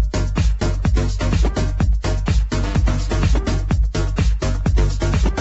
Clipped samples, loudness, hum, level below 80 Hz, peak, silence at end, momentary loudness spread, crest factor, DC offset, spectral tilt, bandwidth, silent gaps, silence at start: under 0.1%; -20 LUFS; none; -18 dBFS; -6 dBFS; 0 s; 2 LU; 12 dB; under 0.1%; -6 dB/octave; 8.2 kHz; none; 0 s